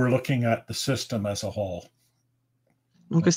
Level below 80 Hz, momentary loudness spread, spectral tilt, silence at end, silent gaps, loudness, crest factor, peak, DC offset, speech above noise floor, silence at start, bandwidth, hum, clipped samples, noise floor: -60 dBFS; 8 LU; -5.5 dB/octave; 0 s; none; -27 LUFS; 18 dB; -8 dBFS; under 0.1%; 47 dB; 0 s; 16 kHz; none; under 0.1%; -72 dBFS